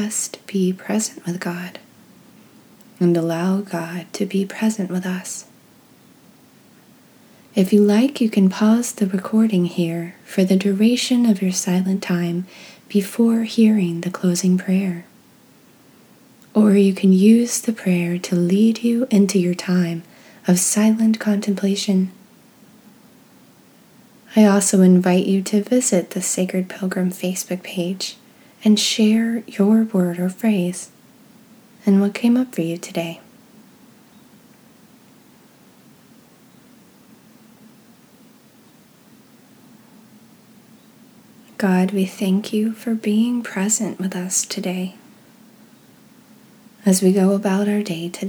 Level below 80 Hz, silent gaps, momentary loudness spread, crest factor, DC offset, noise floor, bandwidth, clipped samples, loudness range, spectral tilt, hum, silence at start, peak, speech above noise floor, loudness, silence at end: -76 dBFS; none; 11 LU; 18 dB; under 0.1%; -51 dBFS; over 20 kHz; under 0.1%; 7 LU; -5.5 dB/octave; none; 0 s; -2 dBFS; 33 dB; -19 LUFS; 0 s